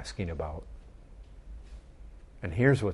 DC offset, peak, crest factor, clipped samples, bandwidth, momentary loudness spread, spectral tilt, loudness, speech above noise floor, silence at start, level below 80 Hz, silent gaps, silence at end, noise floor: under 0.1%; -10 dBFS; 22 dB; under 0.1%; 11.5 kHz; 28 LU; -7 dB/octave; -31 LUFS; 21 dB; 0 s; -46 dBFS; none; 0 s; -49 dBFS